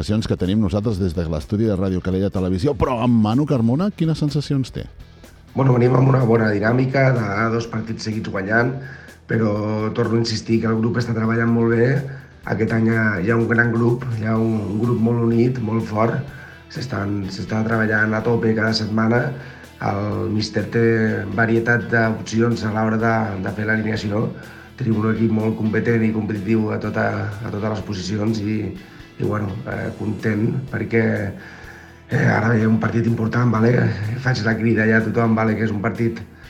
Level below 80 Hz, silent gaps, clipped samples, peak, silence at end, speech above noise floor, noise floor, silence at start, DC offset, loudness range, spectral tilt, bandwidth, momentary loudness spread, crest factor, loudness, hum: -46 dBFS; none; under 0.1%; -2 dBFS; 0 s; 21 dB; -40 dBFS; 0 s; under 0.1%; 4 LU; -7.5 dB/octave; 10 kHz; 10 LU; 18 dB; -20 LUFS; none